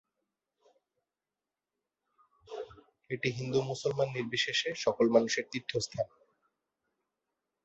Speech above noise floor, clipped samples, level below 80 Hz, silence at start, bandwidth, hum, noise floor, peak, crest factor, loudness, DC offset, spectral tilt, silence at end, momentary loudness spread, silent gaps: over 59 dB; under 0.1%; -70 dBFS; 2.5 s; 8 kHz; none; under -90 dBFS; -12 dBFS; 24 dB; -32 LUFS; under 0.1%; -3.5 dB/octave; 1.6 s; 18 LU; none